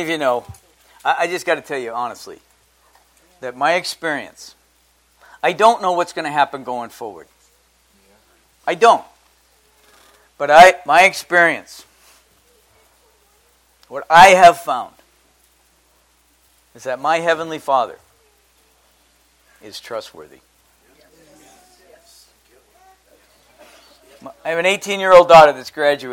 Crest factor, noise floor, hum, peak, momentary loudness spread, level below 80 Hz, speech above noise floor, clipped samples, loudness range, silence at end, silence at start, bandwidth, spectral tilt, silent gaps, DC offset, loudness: 18 dB; -58 dBFS; none; 0 dBFS; 23 LU; -52 dBFS; 43 dB; 0.2%; 21 LU; 0 s; 0 s; 17 kHz; -3 dB/octave; none; under 0.1%; -14 LUFS